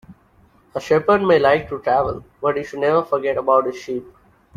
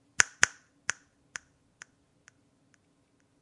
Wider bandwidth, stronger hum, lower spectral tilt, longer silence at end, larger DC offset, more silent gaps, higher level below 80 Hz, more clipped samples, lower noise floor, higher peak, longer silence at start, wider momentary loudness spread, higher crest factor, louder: about the same, 11 kHz vs 11.5 kHz; neither; first, -6.5 dB/octave vs 1 dB/octave; second, 0.5 s vs 2.95 s; neither; neither; first, -52 dBFS vs -72 dBFS; neither; second, -54 dBFS vs -69 dBFS; about the same, -2 dBFS vs 0 dBFS; about the same, 0.1 s vs 0.2 s; second, 14 LU vs 21 LU; second, 18 dB vs 36 dB; first, -19 LUFS vs -28 LUFS